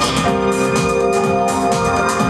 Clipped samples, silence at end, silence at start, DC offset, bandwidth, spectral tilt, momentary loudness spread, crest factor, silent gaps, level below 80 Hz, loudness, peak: under 0.1%; 0 s; 0 s; under 0.1%; 14.5 kHz; -4.5 dB/octave; 1 LU; 12 dB; none; -38 dBFS; -16 LUFS; -4 dBFS